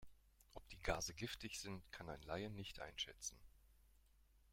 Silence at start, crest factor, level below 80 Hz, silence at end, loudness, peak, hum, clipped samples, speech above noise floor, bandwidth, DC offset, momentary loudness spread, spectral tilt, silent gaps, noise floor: 0 s; 26 dB; -62 dBFS; 0 s; -49 LUFS; -26 dBFS; none; under 0.1%; 24 dB; 16.5 kHz; under 0.1%; 10 LU; -3 dB/octave; none; -73 dBFS